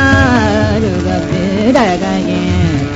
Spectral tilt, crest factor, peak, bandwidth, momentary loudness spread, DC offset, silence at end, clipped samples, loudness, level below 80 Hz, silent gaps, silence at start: -6.5 dB/octave; 12 dB; 0 dBFS; 8 kHz; 5 LU; under 0.1%; 0 s; under 0.1%; -12 LUFS; -28 dBFS; none; 0 s